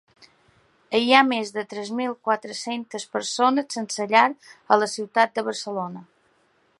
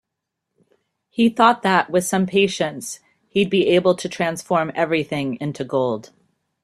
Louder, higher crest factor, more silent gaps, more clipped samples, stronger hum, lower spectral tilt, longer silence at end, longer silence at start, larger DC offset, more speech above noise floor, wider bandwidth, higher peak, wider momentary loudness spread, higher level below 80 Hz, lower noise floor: second, -23 LUFS vs -20 LUFS; about the same, 24 dB vs 20 dB; neither; neither; neither; second, -3 dB/octave vs -5 dB/octave; first, 0.75 s vs 0.6 s; second, 0.9 s vs 1.2 s; neither; second, 41 dB vs 61 dB; second, 11.5 kHz vs 13.5 kHz; about the same, 0 dBFS vs -2 dBFS; about the same, 13 LU vs 11 LU; second, -76 dBFS vs -62 dBFS; second, -64 dBFS vs -80 dBFS